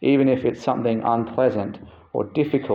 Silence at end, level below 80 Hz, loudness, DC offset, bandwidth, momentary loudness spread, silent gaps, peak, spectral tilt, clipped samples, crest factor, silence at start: 0 s; -60 dBFS; -22 LUFS; under 0.1%; 7.2 kHz; 11 LU; none; -6 dBFS; -8.5 dB/octave; under 0.1%; 16 dB; 0 s